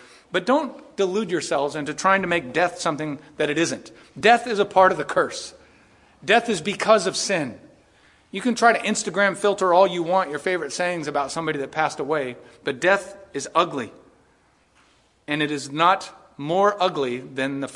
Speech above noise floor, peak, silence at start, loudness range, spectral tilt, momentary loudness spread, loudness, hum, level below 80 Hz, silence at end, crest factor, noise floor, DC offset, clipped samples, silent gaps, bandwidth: 38 dB; -2 dBFS; 0.3 s; 4 LU; -3.5 dB/octave; 14 LU; -22 LUFS; none; -64 dBFS; 0 s; 20 dB; -60 dBFS; under 0.1%; under 0.1%; none; 11.5 kHz